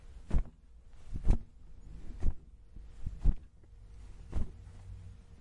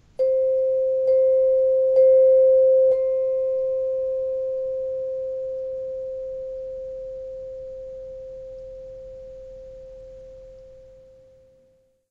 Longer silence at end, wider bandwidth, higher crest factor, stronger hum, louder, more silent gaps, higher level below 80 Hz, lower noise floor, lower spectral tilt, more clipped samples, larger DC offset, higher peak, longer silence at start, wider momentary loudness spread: second, 0.05 s vs 1.3 s; first, 3.8 kHz vs 2.2 kHz; first, 20 dB vs 14 dB; neither; second, -40 LUFS vs -21 LUFS; neither; first, -36 dBFS vs -54 dBFS; second, -54 dBFS vs -61 dBFS; about the same, -8 dB/octave vs -7 dB/octave; neither; neither; second, -14 dBFS vs -10 dBFS; second, 0.05 s vs 0.2 s; second, 21 LU vs 24 LU